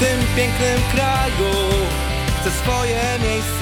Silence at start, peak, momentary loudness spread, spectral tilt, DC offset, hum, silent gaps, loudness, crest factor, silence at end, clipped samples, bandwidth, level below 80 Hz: 0 s; -4 dBFS; 3 LU; -4.5 dB/octave; under 0.1%; none; none; -19 LUFS; 14 dB; 0 s; under 0.1%; 19.5 kHz; -26 dBFS